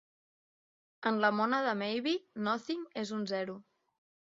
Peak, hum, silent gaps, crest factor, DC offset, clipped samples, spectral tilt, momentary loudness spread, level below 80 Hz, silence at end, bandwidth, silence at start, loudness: -14 dBFS; none; none; 22 dB; under 0.1%; under 0.1%; -2.5 dB/octave; 9 LU; -82 dBFS; 0.75 s; 7.4 kHz; 1 s; -33 LUFS